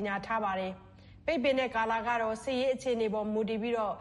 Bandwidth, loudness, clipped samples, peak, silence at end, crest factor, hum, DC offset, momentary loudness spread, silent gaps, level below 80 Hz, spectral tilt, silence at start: 11.5 kHz; -31 LUFS; under 0.1%; -16 dBFS; 0 s; 16 dB; none; under 0.1%; 6 LU; none; -60 dBFS; -5 dB/octave; 0 s